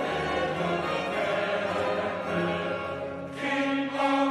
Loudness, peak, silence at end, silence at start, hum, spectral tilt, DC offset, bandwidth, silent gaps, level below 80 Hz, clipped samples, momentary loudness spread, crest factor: -28 LUFS; -12 dBFS; 0 s; 0 s; none; -5.5 dB/octave; under 0.1%; 12.5 kHz; none; -58 dBFS; under 0.1%; 6 LU; 16 dB